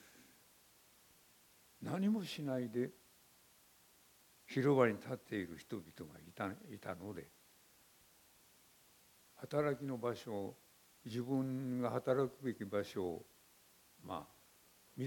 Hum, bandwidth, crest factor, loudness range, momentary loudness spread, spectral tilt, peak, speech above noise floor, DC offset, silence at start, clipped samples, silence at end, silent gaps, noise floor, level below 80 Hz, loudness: none; 17.5 kHz; 24 dB; 9 LU; 18 LU; -7 dB/octave; -18 dBFS; 29 dB; under 0.1%; 0.05 s; under 0.1%; 0 s; none; -68 dBFS; -78 dBFS; -40 LUFS